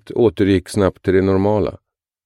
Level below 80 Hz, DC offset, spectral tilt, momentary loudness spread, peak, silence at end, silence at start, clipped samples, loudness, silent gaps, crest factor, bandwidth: -44 dBFS; under 0.1%; -7.5 dB/octave; 5 LU; -2 dBFS; 0.5 s; 0.1 s; under 0.1%; -17 LUFS; none; 14 dB; 12 kHz